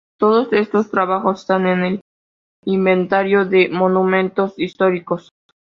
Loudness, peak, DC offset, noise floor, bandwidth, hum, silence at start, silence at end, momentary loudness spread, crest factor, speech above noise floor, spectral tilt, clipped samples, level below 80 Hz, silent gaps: -17 LUFS; -2 dBFS; under 0.1%; under -90 dBFS; 7 kHz; none; 0.2 s; 0.6 s; 8 LU; 16 dB; over 74 dB; -8 dB/octave; under 0.1%; -62 dBFS; 2.01-2.63 s